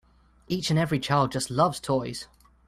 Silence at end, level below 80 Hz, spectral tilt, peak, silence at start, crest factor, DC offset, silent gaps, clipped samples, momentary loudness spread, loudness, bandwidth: 0.45 s; -56 dBFS; -5.5 dB/octave; -8 dBFS; 0.5 s; 18 dB; under 0.1%; none; under 0.1%; 12 LU; -26 LUFS; 14.5 kHz